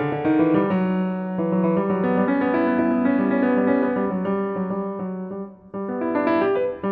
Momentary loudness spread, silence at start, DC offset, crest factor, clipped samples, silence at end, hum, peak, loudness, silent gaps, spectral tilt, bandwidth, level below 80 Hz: 10 LU; 0 s; under 0.1%; 14 dB; under 0.1%; 0 s; none; -6 dBFS; -22 LUFS; none; -11 dB/octave; 4.7 kHz; -58 dBFS